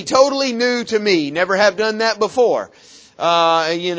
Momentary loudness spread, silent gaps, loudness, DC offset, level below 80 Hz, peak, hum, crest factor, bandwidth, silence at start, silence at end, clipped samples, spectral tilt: 4 LU; none; -16 LUFS; under 0.1%; -60 dBFS; 0 dBFS; none; 16 dB; 8 kHz; 0 s; 0 s; under 0.1%; -3.5 dB/octave